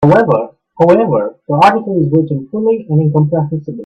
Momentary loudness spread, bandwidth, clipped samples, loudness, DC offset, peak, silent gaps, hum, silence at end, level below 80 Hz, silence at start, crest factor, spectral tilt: 8 LU; 8.2 kHz; under 0.1%; -12 LUFS; under 0.1%; 0 dBFS; none; none; 0 s; -50 dBFS; 0 s; 12 dB; -9 dB/octave